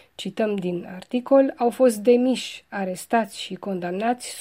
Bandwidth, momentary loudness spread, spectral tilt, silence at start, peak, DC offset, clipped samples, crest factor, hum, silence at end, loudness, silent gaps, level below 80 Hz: 16 kHz; 12 LU; -5 dB/octave; 0.2 s; -6 dBFS; under 0.1%; under 0.1%; 18 dB; none; 0 s; -23 LUFS; none; -70 dBFS